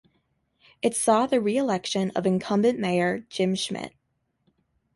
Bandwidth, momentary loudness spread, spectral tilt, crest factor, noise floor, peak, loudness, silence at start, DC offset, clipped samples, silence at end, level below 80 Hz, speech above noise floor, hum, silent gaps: 11.5 kHz; 7 LU; -4.5 dB/octave; 18 dB; -75 dBFS; -8 dBFS; -25 LUFS; 0.85 s; under 0.1%; under 0.1%; 1.1 s; -66 dBFS; 51 dB; none; none